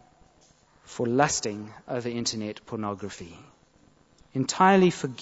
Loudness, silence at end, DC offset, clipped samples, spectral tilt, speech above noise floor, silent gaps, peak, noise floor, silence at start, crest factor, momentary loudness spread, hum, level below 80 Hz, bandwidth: -26 LUFS; 0 s; under 0.1%; under 0.1%; -4.5 dB/octave; 34 dB; none; -6 dBFS; -60 dBFS; 0.9 s; 22 dB; 19 LU; none; -62 dBFS; 8 kHz